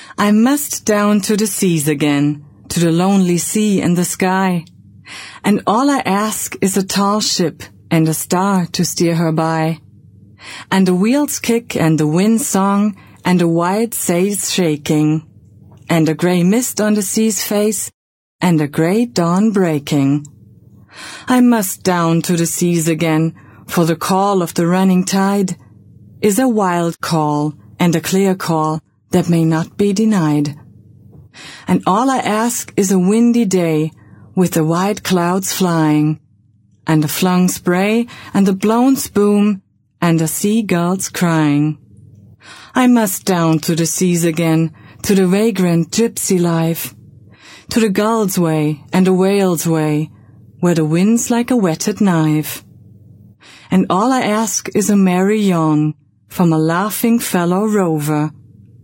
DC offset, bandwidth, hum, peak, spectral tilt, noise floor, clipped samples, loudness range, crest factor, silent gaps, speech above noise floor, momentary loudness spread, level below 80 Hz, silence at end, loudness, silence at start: under 0.1%; 16.5 kHz; none; 0 dBFS; -5.5 dB/octave; -52 dBFS; under 0.1%; 2 LU; 16 dB; 17.94-18.39 s; 38 dB; 7 LU; -54 dBFS; 0.55 s; -15 LUFS; 0 s